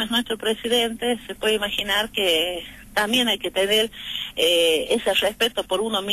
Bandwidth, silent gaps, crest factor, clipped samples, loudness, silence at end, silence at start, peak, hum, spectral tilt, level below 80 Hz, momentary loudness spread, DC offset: 13.5 kHz; none; 14 dB; under 0.1%; -21 LUFS; 0 s; 0 s; -10 dBFS; none; -2 dB/octave; -50 dBFS; 7 LU; under 0.1%